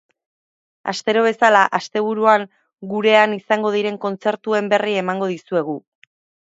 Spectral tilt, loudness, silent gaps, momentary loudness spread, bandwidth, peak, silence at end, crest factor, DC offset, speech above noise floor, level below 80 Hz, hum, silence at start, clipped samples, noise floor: -4.5 dB/octave; -18 LUFS; none; 13 LU; 7.8 kHz; 0 dBFS; 0.7 s; 20 dB; under 0.1%; over 72 dB; -72 dBFS; none; 0.85 s; under 0.1%; under -90 dBFS